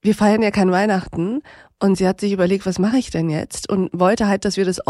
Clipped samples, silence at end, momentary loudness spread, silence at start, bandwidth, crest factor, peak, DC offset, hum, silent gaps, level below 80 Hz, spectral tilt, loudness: under 0.1%; 0.05 s; 7 LU; 0.05 s; 12 kHz; 14 dB; -4 dBFS; under 0.1%; none; none; -46 dBFS; -6 dB/octave; -19 LUFS